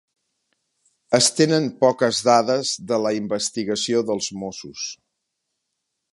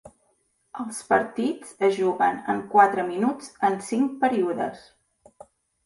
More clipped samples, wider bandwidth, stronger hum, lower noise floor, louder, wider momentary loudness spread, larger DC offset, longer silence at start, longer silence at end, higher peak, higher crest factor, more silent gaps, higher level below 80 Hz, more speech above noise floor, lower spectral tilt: neither; about the same, 11.5 kHz vs 11.5 kHz; neither; first, -78 dBFS vs -69 dBFS; first, -20 LUFS vs -24 LUFS; about the same, 14 LU vs 13 LU; neither; first, 1.1 s vs 0.05 s; first, 1.2 s vs 1.05 s; about the same, -2 dBFS vs -4 dBFS; about the same, 20 dB vs 20 dB; neither; about the same, -66 dBFS vs -68 dBFS; first, 58 dB vs 45 dB; second, -3.5 dB/octave vs -5 dB/octave